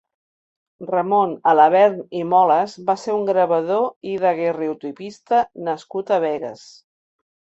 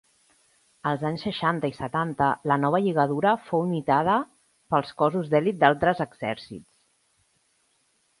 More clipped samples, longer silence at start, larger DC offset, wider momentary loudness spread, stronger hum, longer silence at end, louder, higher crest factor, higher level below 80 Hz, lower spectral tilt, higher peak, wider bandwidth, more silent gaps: neither; about the same, 0.8 s vs 0.85 s; neither; about the same, 13 LU vs 11 LU; neither; second, 1 s vs 1.6 s; first, -19 LUFS vs -25 LUFS; second, 16 dB vs 22 dB; second, -70 dBFS vs -60 dBFS; about the same, -6 dB/octave vs -7 dB/octave; about the same, -2 dBFS vs -4 dBFS; second, 8 kHz vs 11.5 kHz; first, 3.96-4.01 s vs none